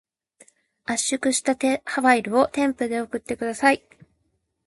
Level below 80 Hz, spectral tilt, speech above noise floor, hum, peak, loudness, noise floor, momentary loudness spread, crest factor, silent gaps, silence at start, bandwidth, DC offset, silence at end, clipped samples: -62 dBFS; -2.5 dB/octave; 50 dB; none; -4 dBFS; -22 LUFS; -72 dBFS; 9 LU; 20 dB; none; 0.9 s; 11.5 kHz; under 0.1%; 0.9 s; under 0.1%